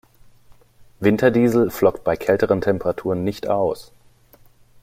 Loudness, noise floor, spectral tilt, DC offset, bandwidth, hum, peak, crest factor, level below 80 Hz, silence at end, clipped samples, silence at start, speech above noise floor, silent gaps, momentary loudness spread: -20 LUFS; -52 dBFS; -7 dB/octave; under 0.1%; 16 kHz; none; -2 dBFS; 20 dB; -50 dBFS; 1 s; under 0.1%; 1 s; 33 dB; none; 7 LU